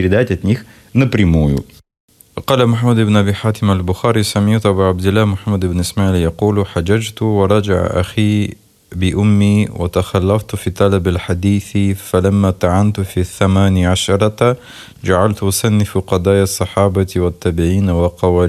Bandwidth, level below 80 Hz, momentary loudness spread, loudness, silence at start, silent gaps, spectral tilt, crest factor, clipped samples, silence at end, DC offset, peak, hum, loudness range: 14 kHz; -38 dBFS; 5 LU; -15 LUFS; 0 s; 2.00-2.08 s; -6.5 dB/octave; 14 dB; under 0.1%; 0 s; under 0.1%; 0 dBFS; none; 1 LU